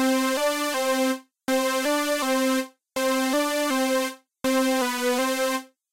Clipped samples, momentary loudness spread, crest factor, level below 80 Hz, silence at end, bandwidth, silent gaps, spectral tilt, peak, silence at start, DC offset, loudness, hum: under 0.1%; 5 LU; 10 dB; -66 dBFS; 0.25 s; 16 kHz; none; -1 dB/octave; -14 dBFS; 0 s; under 0.1%; -24 LUFS; none